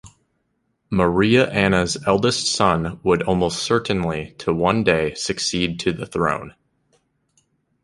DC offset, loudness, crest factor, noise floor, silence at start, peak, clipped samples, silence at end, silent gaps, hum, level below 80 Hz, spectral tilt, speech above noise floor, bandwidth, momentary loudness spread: under 0.1%; -20 LUFS; 18 dB; -70 dBFS; 0.05 s; -2 dBFS; under 0.1%; 1.35 s; none; none; -44 dBFS; -4.5 dB/octave; 51 dB; 11.5 kHz; 8 LU